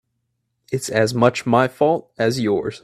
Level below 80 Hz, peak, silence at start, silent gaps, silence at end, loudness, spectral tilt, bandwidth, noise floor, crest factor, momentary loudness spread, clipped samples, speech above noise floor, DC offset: -58 dBFS; 0 dBFS; 0.7 s; none; 0.05 s; -19 LUFS; -5.5 dB/octave; 15 kHz; -73 dBFS; 20 dB; 6 LU; under 0.1%; 55 dB; under 0.1%